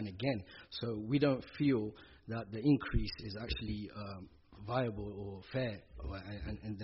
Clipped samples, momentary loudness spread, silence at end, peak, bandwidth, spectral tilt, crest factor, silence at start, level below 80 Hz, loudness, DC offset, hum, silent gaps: under 0.1%; 14 LU; 0 s; -18 dBFS; 5.8 kHz; -6 dB/octave; 18 dB; 0 s; -50 dBFS; -38 LUFS; under 0.1%; none; none